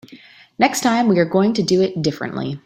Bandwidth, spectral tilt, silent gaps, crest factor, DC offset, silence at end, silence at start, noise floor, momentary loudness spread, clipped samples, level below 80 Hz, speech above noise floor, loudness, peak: 16 kHz; -5 dB/octave; none; 16 dB; under 0.1%; 0.05 s; 0.1 s; -45 dBFS; 7 LU; under 0.1%; -58 dBFS; 27 dB; -18 LUFS; -2 dBFS